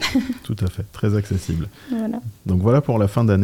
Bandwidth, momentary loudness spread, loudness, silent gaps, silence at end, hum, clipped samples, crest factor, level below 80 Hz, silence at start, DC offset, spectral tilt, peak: 16 kHz; 10 LU; -22 LUFS; none; 0 s; none; under 0.1%; 14 dB; -44 dBFS; 0 s; under 0.1%; -7 dB/octave; -6 dBFS